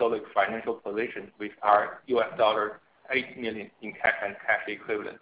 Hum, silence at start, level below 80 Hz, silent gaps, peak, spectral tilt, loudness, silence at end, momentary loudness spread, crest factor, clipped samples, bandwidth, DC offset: none; 0 s; -66 dBFS; none; -8 dBFS; -7.5 dB/octave; -28 LUFS; 0.05 s; 11 LU; 22 dB; under 0.1%; 4 kHz; under 0.1%